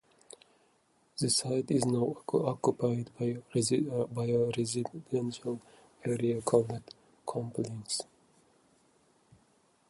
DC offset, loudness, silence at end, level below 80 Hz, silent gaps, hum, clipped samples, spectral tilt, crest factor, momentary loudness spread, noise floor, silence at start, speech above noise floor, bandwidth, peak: under 0.1%; -32 LUFS; 1.85 s; -70 dBFS; none; none; under 0.1%; -5.5 dB/octave; 22 dB; 12 LU; -70 dBFS; 1.15 s; 38 dB; 11.5 kHz; -12 dBFS